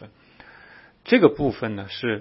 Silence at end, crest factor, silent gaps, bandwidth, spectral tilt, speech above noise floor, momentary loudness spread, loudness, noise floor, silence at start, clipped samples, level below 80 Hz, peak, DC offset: 0 s; 22 dB; none; 5.8 kHz; -10.5 dB/octave; 29 dB; 12 LU; -21 LUFS; -50 dBFS; 0 s; under 0.1%; -52 dBFS; -2 dBFS; under 0.1%